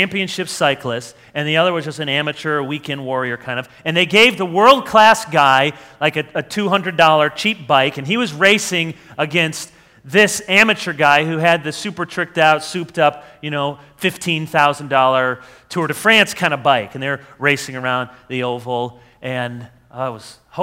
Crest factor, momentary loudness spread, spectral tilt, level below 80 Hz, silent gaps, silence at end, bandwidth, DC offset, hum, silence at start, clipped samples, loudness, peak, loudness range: 18 dB; 14 LU; -4 dB/octave; -58 dBFS; none; 0 s; 16.5 kHz; under 0.1%; none; 0 s; under 0.1%; -16 LUFS; 0 dBFS; 6 LU